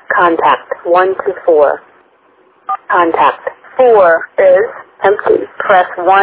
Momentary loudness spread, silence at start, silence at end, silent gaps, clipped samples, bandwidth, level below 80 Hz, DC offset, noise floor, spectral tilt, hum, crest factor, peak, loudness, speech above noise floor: 12 LU; 0.1 s; 0 s; none; 0.3%; 4 kHz; -54 dBFS; under 0.1%; -49 dBFS; -8 dB/octave; none; 12 dB; 0 dBFS; -11 LUFS; 39 dB